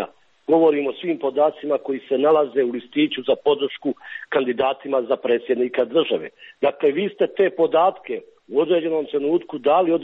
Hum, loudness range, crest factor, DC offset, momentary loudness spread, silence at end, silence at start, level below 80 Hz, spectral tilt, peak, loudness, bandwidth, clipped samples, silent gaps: none; 2 LU; 14 dB; under 0.1%; 8 LU; 0 s; 0 s; -68 dBFS; -8 dB/octave; -6 dBFS; -21 LUFS; 4.1 kHz; under 0.1%; none